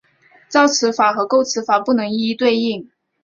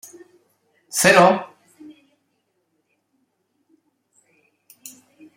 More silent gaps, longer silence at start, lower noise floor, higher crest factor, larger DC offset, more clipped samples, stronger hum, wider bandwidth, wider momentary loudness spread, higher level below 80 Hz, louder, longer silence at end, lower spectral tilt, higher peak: neither; second, 0.5 s vs 0.95 s; second, -52 dBFS vs -71 dBFS; second, 16 dB vs 22 dB; neither; neither; neither; second, 7.4 kHz vs 16 kHz; second, 6 LU vs 29 LU; about the same, -64 dBFS vs -68 dBFS; about the same, -17 LUFS vs -16 LUFS; second, 0.4 s vs 3.9 s; about the same, -3 dB/octave vs -3.5 dB/octave; about the same, -2 dBFS vs -2 dBFS